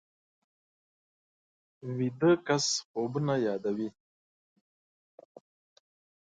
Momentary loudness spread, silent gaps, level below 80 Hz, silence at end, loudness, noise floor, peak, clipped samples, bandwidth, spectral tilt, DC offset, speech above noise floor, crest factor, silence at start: 12 LU; 2.85-2.94 s; -72 dBFS; 2.45 s; -30 LUFS; under -90 dBFS; -14 dBFS; under 0.1%; 9.4 kHz; -4.5 dB/octave; under 0.1%; over 61 dB; 20 dB; 1.85 s